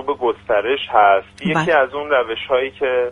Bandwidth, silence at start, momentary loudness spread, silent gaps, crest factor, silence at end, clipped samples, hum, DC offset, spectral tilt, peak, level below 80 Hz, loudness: 10.5 kHz; 0 s; 6 LU; none; 16 dB; 0 s; under 0.1%; none; under 0.1%; -5.5 dB/octave; 0 dBFS; -52 dBFS; -17 LUFS